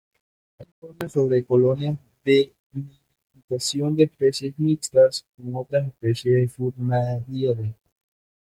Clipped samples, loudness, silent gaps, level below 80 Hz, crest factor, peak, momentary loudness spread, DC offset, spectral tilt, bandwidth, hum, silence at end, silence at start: under 0.1%; -23 LUFS; 0.72-0.82 s, 2.59-2.70 s, 3.44-3.48 s, 5.29-5.33 s; -62 dBFS; 18 dB; -4 dBFS; 14 LU; under 0.1%; -6 dB/octave; 15 kHz; none; 0.7 s; 0.6 s